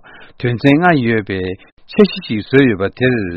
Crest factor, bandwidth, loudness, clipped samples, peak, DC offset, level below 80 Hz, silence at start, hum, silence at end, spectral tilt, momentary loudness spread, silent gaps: 14 dB; 5.8 kHz; -14 LUFS; 0.1%; 0 dBFS; under 0.1%; -46 dBFS; 0.15 s; none; 0 s; -8.5 dB/octave; 11 LU; 1.72-1.77 s